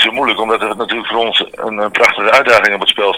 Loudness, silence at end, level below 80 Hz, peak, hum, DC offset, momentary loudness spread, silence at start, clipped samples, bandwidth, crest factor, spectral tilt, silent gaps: -12 LUFS; 0 s; -54 dBFS; 0 dBFS; none; under 0.1%; 9 LU; 0 s; 0.7%; over 20 kHz; 12 dB; -2 dB/octave; none